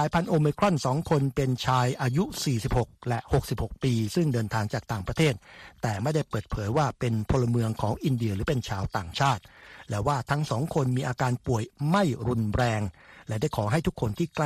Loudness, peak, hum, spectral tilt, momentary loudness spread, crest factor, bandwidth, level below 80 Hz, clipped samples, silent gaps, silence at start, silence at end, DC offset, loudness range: -27 LUFS; -8 dBFS; none; -6.5 dB/octave; 7 LU; 18 dB; 14.5 kHz; -44 dBFS; under 0.1%; none; 0 s; 0 s; under 0.1%; 2 LU